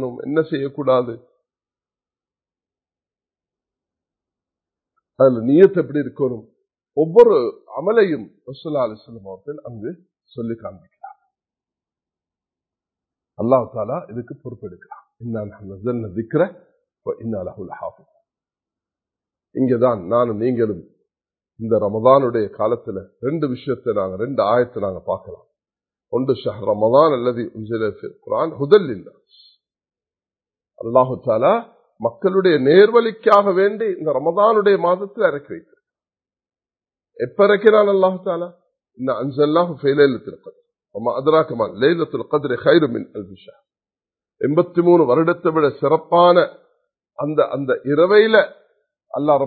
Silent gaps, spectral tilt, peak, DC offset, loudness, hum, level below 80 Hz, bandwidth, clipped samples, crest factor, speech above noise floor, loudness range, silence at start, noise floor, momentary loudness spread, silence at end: none; -9 dB/octave; 0 dBFS; under 0.1%; -18 LUFS; none; -60 dBFS; 4.6 kHz; under 0.1%; 20 dB; over 73 dB; 10 LU; 0 s; under -90 dBFS; 19 LU; 0 s